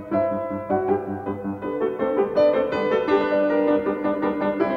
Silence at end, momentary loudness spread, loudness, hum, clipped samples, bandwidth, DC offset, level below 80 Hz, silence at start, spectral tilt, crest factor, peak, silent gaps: 0 s; 9 LU; -23 LUFS; none; under 0.1%; 6.4 kHz; under 0.1%; -56 dBFS; 0 s; -8 dB/octave; 14 dB; -8 dBFS; none